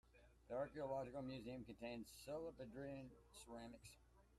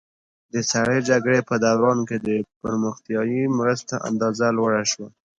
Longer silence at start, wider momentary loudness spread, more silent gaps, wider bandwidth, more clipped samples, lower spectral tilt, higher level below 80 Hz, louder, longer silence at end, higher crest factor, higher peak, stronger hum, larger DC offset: second, 0.05 s vs 0.55 s; first, 12 LU vs 7 LU; second, none vs 2.56-2.61 s; first, 14 kHz vs 9.8 kHz; neither; about the same, -5.5 dB/octave vs -4.5 dB/octave; second, -72 dBFS vs -60 dBFS; second, -53 LUFS vs -22 LUFS; second, 0 s vs 0.3 s; about the same, 16 dB vs 16 dB; second, -36 dBFS vs -6 dBFS; neither; neither